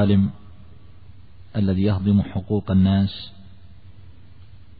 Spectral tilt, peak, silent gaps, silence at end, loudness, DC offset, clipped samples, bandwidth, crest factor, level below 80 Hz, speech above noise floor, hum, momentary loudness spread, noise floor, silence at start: -12.5 dB/octave; -8 dBFS; none; 1.5 s; -21 LUFS; 0.8%; under 0.1%; 4.9 kHz; 16 dB; -48 dBFS; 27 dB; none; 11 LU; -47 dBFS; 0 s